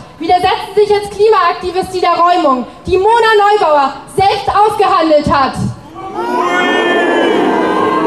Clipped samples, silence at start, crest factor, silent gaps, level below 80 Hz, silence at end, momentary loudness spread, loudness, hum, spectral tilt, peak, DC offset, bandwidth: under 0.1%; 0 s; 10 dB; none; -40 dBFS; 0 s; 8 LU; -11 LUFS; none; -5 dB/octave; -2 dBFS; 0.3%; 13 kHz